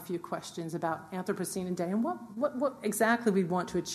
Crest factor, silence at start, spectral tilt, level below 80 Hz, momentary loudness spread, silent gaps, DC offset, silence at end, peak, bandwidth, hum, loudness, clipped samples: 20 dB; 0 s; -5 dB/octave; -68 dBFS; 9 LU; none; under 0.1%; 0 s; -12 dBFS; 13.5 kHz; none; -32 LUFS; under 0.1%